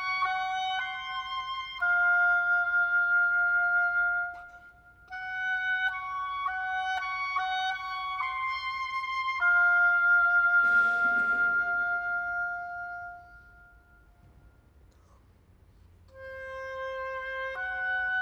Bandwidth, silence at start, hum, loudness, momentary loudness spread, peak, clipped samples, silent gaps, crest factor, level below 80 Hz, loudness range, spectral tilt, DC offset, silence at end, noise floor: 6.8 kHz; 0 s; none; -27 LUFS; 15 LU; -16 dBFS; under 0.1%; none; 12 dB; -62 dBFS; 16 LU; -2 dB/octave; under 0.1%; 0 s; -59 dBFS